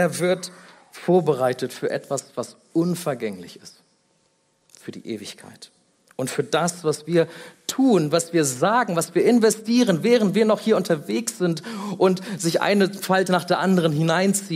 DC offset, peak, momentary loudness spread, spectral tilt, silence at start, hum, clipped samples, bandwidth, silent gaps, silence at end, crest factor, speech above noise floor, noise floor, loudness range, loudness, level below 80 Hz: under 0.1%; -4 dBFS; 14 LU; -5 dB/octave; 0 s; none; under 0.1%; 16 kHz; none; 0 s; 18 dB; 44 dB; -66 dBFS; 11 LU; -21 LUFS; -70 dBFS